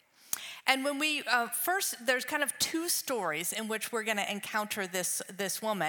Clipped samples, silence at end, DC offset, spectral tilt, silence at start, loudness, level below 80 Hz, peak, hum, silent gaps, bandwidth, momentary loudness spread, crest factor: under 0.1%; 0 s; under 0.1%; -1.5 dB/octave; 0.25 s; -31 LUFS; -84 dBFS; -8 dBFS; none; none; 19 kHz; 5 LU; 24 dB